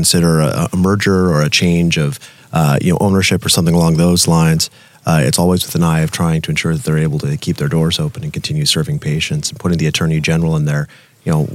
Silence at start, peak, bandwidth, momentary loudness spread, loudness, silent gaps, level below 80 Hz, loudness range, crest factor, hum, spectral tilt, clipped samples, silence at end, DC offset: 0 s; 0 dBFS; 16 kHz; 8 LU; -14 LUFS; none; -42 dBFS; 4 LU; 14 dB; none; -5 dB/octave; under 0.1%; 0 s; under 0.1%